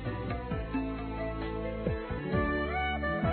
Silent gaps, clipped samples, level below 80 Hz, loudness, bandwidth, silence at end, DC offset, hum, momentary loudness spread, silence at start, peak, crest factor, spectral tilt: none; under 0.1%; -42 dBFS; -34 LUFS; 4.5 kHz; 0 s; under 0.1%; none; 6 LU; 0 s; -18 dBFS; 16 dB; -10.5 dB/octave